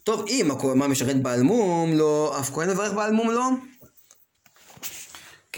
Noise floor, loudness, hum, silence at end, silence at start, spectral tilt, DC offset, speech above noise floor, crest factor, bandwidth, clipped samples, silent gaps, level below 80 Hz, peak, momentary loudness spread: -59 dBFS; -23 LUFS; none; 0 s; 0.05 s; -5 dB/octave; under 0.1%; 36 dB; 16 dB; 17 kHz; under 0.1%; none; -64 dBFS; -10 dBFS; 14 LU